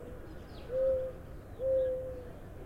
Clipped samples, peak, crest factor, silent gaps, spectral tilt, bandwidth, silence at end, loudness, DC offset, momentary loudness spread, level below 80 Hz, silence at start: under 0.1%; -22 dBFS; 14 dB; none; -7.5 dB/octave; 13 kHz; 0 s; -34 LUFS; under 0.1%; 17 LU; -50 dBFS; 0 s